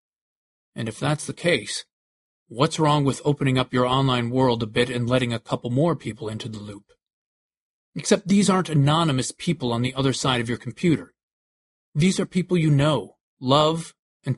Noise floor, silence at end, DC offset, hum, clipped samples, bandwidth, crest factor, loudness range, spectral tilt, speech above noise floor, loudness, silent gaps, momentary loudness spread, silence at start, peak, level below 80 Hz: under -90 dBFS; 0 s; under 0.1%; none; under 0.1%; 11.5 kHz; 20 dB; 3 LU; -5.5 dB/octave; over 68 dB; -23 LUFS; 1.93-2.46 s, 7.13-7.50 s, 7.60-7.92 s, 11.23-11.92 s, 13.20-13.37 s, 13.99-14.20 s; 13 LU; 0.75 s; -2 dBFS; -54 dBFS